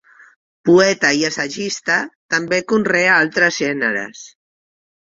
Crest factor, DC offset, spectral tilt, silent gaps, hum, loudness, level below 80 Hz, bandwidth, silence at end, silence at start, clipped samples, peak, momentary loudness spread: 16 dB; under 0.1%; -3.5 dB/octave; 2.15-2.29 s; none; -16 LUFS; -60 dBFS; 7.8 kHz; 0.85 s; 0.65 s; under 0.1%; -2 dBFS; 9 LU